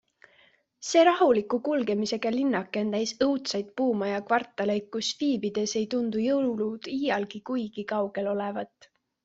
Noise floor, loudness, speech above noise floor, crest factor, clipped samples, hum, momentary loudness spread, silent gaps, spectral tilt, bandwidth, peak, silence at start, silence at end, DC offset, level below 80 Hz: -63 dBFS; -27 LUFS; 36 dB; 18 dB; under 0.1%; none; 8 LU; none; -4.5 dB/octave; 8 kHz; -8 dBFS; 0.8 s; 0.6 s; under 0.1%; -70 dBFS